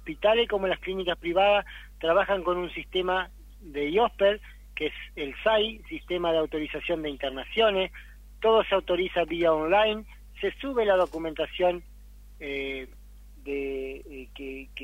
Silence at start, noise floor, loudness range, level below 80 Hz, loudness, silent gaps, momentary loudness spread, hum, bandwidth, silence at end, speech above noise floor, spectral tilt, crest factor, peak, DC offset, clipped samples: 0 s; -48 dBFS; 4 LU; -48 dBFS; -27 LUFS; none; 15 LU; 50 Hz at -45 dBFS; 16 kHz; 0 s; 21 dB; -5.5 dB/octave; 16 dB; -10 dBFS; under 0.1%; under 0.1%